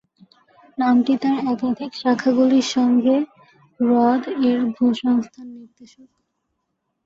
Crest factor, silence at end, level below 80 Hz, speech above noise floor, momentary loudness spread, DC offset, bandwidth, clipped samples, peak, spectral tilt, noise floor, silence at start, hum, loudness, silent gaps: 14 dB; 1.2 s; -66 dBFS; 56 dB; 9 LU; under 0.1%; 7.6 kHz; under 0.1%; -6 dBFS; -5 dB/octave; -75 dBFS; 0.8 s; none; -19 LUFS; none